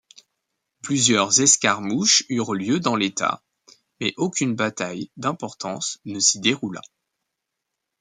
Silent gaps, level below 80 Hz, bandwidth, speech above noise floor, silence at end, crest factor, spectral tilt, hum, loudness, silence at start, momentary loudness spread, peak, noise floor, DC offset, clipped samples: none; -68 dBFS; 11 kHz; 59 dB; 1.2 s; 22 dB; -2.5 dB/octave; none; -20 LUFS; 0.85 s; 14 LU; -2 dBFS; -81 dBFS; under 0.1%; under 0.1%